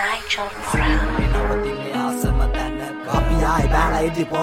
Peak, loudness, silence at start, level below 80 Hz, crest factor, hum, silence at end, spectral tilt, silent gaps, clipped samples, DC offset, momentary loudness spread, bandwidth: -4 dBFS; -21 LUFS; 0 s; -24 dBFS; 16 dB; none; 0 s; -5.5 dB/octave; none; under 0.1%; under 0.1%; 6 LU; 15.5 kHz